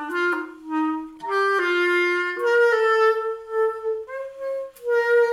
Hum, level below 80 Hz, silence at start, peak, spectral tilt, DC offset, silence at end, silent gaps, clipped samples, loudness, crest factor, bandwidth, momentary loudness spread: none; -68 dBFS; 0 s; -8 dBFS; -2.5 dB/octave; under 0.1%; 0 s; none; under 0.1%; -22 LUFS; 14 dB; 13 kHz; 12 LU